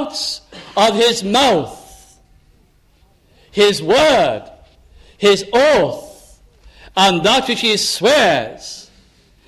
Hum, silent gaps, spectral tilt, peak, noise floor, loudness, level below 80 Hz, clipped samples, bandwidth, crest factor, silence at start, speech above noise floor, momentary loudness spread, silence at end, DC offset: none; none; -3 dB/octave; -2 dBFS; -53 dBFS; -14 LUFS; -48 dBFS; under 0.1%; 15 kHz; 16 dB; 0 s; 40 dB; 16 LU; 0.65 s; under 0.1%